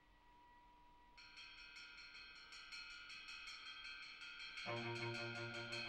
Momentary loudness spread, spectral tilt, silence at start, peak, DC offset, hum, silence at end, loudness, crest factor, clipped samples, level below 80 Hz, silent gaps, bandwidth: 22 LU; -4 dB/octave; 0 s; -34 dBFS; under 0.1%; none; 0 s; -51 LUFS; 20 dB; under 0.1%; -76 dBFS; none; 12 kHz